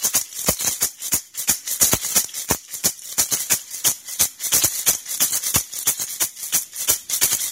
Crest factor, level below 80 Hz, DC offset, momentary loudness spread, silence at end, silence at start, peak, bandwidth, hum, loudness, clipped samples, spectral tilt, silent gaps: 22 dB; -48 dBFS; under 0.1%; 5 LU; 0 s; 0 s; 0 dBFS; 16.5 kHz; none; -19 LUFS; under 0.1%; 0 dB/octave; none